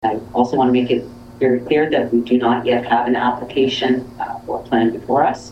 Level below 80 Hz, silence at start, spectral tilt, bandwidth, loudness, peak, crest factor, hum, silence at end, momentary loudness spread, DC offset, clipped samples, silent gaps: -50 dBFS; 0 s; -6 dB/octave; 8.4 kHz; -18 LUFS; -2 dBFS; 16 dB; none; 0 s; 6 LU; under 0.1%; under 0.1%; none